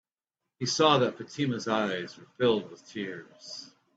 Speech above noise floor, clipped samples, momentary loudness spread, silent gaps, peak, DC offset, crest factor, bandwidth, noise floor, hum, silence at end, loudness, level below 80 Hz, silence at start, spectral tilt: 59 dB; under 0.1%; 19 LU; none; -8 dBFS; under 0.1%; 22 dB; 8 kHz; -88 dBFS; none; 0.3 s; -28 LUFS; -72 dBFS; 0.6 s; -4.5 dB/octave